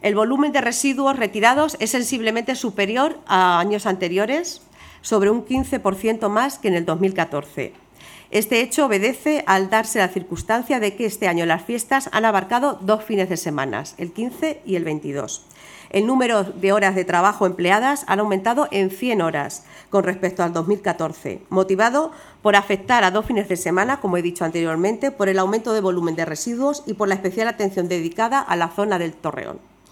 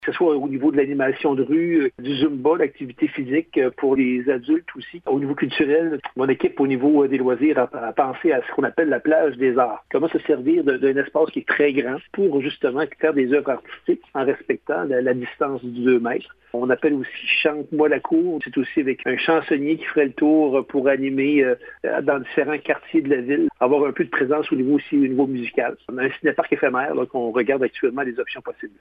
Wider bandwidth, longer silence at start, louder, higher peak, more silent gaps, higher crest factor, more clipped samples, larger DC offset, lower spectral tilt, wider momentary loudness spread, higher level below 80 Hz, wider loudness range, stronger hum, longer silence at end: first, 18.5 kHz vs 5 kHz; about the same, 0.05 s vs 0 s; about the same, -20 LUFS vs -21 LUFS; first, 0 dBFS vs -4 dBFS; neither; about the same, 20 dB vs 16 dB; neither; neither; second, -4.5 dB/octave vs -9 dB/octave; first, 9 LU vs 6 LU; first, -52 dBFS vs -64 dBFS; about the same, 3 LU vs 2 LU; neither; first, 0.35 s vs 0.1 s